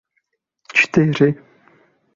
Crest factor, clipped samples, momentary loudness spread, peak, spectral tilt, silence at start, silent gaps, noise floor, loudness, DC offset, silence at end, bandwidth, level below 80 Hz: 20 dB; under 0.1%; 6 LU; 0 dBFS; -6.5 dB/octave; 0.75 s; none; -71 dBFS; -16 LUFS; under 0.1%; 0.8 s; 7.6 kHz; -56 dBFS